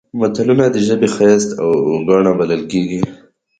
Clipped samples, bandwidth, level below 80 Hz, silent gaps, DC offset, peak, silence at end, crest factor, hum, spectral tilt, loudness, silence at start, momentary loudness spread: under 0.1%; 9.4 kHz; -52 dBFS; none; under 0.1%; 0 dBFS; 0.45 s; 14 dB; none; -6 dB/octave; -14 LUFS; 0.15 s; 7 LU